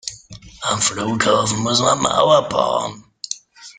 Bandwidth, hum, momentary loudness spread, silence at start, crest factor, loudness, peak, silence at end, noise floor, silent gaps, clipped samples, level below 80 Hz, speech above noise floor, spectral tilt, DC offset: 10 kHz; none; 15 LU; 0.05 s; 18 dB; -17 LUFS; -2 dBFS; 0.05 s; -40 dBFS; none; under 0.1%; -52 dBFS; 23 dB; -3 dB/octave; under 0.1%